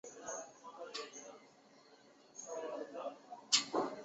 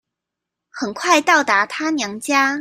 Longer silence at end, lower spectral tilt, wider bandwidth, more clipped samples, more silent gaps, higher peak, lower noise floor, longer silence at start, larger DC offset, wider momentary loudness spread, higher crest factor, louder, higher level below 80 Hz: about the same, 0 s vs 0 s; second, 0 dB/octave vs -2 dB/octave; second, 8 kHz vs 15.5 kHz; neither; neither; second, -16 dBFS vs -2 dBFS; second, -64 dBFS vs -83 dBFS; second, 0.05 s vs 0.75 s; neither; first, 22 LU vs 11 LU; first, 28 dB vs 18 dB; second, -39 LUFS vs -17 LUFS; second, -88 dBFS vs -66 dBFS